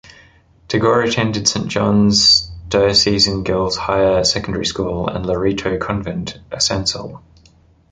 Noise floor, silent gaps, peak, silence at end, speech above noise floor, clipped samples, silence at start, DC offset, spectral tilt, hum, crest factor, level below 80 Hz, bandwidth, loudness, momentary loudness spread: -51 dBFS; none; -2 dBFS; 0.7 s; 34 dB; under 0.1%; 0.7 s; under 0.1%; -4 dB/octave; none; 16 dB; -38 dBFS; 9.4 kHz; -16 LUFS; 11 LU